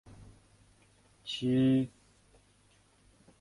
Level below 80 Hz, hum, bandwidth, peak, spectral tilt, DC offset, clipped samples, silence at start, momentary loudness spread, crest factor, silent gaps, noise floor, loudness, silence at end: -64 dBFS; 50 Hz at -60 dBFS; 11.5 kHz; -18 dBFS; -7 dB/octave; under 0.1%; under 0.1%; 0.2 s; 14 LU; 16 dB; none; -66 dBFS; -30 LUFS; 1.5 s